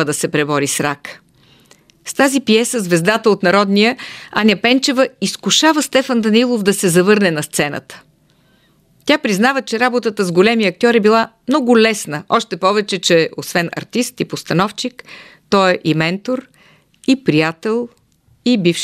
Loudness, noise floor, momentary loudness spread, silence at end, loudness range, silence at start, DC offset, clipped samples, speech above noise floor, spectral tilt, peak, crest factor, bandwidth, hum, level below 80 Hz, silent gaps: -15 LUFS; -54 dBFS; 10 LU; 0 s; 4 LU; 0 s; under 0.1%; under 0.1%; 40 dB; -4 dB/octave; 0 dBFS; 16 dB; 15.5 kHz; none; -60 dBFS; none